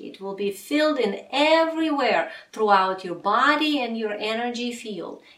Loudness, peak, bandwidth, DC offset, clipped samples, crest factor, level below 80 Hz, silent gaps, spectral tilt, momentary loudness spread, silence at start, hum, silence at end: -23 LUFS; -6 dBFS; 15.5 kHz; under 0.1%; under 0.1%; 18 dB; -74 dBFS; none; -4 dB/octave; 11 LU; 0 s; none; 0.2 s